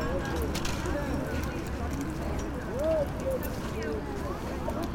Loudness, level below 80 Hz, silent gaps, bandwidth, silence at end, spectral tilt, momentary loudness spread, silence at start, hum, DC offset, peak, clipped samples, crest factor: -32 LUFS; -38 dBFS; none; 18 kHz; 0 s; -6 dB/octave; 5 LU; 0 s; none; under 0.1%; -16 dBFS; under 0.1%; 16 dB